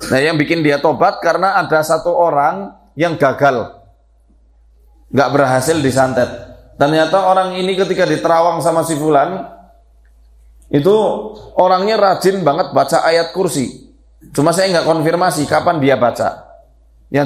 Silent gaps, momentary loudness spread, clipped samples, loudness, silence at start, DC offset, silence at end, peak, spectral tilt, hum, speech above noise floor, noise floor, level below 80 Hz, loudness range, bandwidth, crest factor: none; 8 LU; under 0.1%; -14 LUFS; 0 s; under 0.1%; 0 s; 0 dBFS; -5 dB/octave; none; 37 dB; -50 dBFS; -48 dBFS; 3 LU; 15.5 kHz; 14 dB